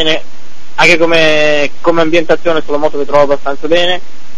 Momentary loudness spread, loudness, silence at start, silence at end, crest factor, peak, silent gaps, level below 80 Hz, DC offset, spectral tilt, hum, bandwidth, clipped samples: 8 LU; -11 LUFS; 0 s; 0.35 s; 14 dB; 0 dBFS; none; -42 dBFS; 30%; -4 dB/octave; none; 12 kHz; 0.9%